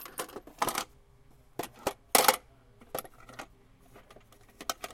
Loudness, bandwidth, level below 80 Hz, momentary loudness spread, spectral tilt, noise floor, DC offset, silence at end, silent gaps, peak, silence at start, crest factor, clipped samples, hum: -31 LUFS; 17 kHz; -62 dBFS; 24 LU; -1 dB/octave; -59 dBFS; under 0.1%; 0 s; none; -4 dBFS; 0 s; 30 dB; under 0.1%; none